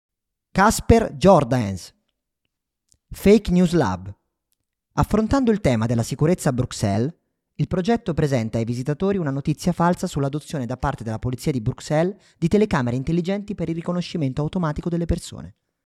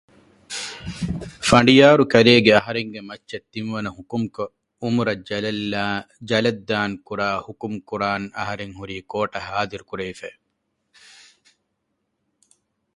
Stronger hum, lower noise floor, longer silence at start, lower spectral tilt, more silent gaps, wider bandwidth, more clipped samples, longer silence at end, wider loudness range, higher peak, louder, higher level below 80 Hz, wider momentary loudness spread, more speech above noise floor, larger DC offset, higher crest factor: neither; first, -79 dBFS vs -75 dBFS; about the same, 0.55 s vs 0.5 s; first, -6.5 dB/octave vs -5 dB/octave; neither; first, 15 kHz vs 11.5 kHz; neither; second, 0.4 s vs 2.65 s; second, 3 LU vs 14 LU; about the same, -2 dBFS vs 0 dBFS; about the same, -22 LUFS vs -20 LUFS; first, -38 dBFS vs -50 dBFS; second, 11 LU vs 19 LU; first, 59 dB vs 54 dB; neither; about the same, 20 dB vs 22 dB